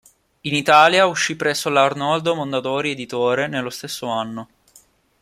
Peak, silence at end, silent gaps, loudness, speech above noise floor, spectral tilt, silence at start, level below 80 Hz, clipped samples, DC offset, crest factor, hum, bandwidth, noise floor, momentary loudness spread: 0 dBFS; 0.75 s; none; -19 LUFS; 35 dB; -3.5 dB/octave; 0.45 s; -62 dBFS; under 0.1%; under 0.1%; 18 dB; none; 16 kHz; -54 dBFS; 15 LU